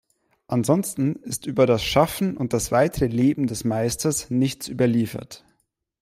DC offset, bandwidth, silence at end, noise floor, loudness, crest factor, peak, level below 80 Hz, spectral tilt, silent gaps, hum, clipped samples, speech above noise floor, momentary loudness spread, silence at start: under 0.1%; 16 kHz; 0.65 s; -71 dBFS; -22 LUFS; 18 dB; -4 dBFS; -48 dBFS; -5.5 dB/octave; none; none; under 0.1%; 49 dB; 7 LU; 0.5 s